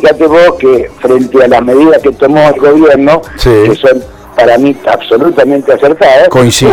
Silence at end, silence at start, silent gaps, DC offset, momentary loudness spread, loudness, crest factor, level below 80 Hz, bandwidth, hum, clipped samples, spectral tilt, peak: 0 s; 0 s; none; under 0.1%; 5 LU; -6 LUFS; 6 dB; -28 dBFS; 18 kHz; none; 3%; -5.5 dB/octave; 0 dBFS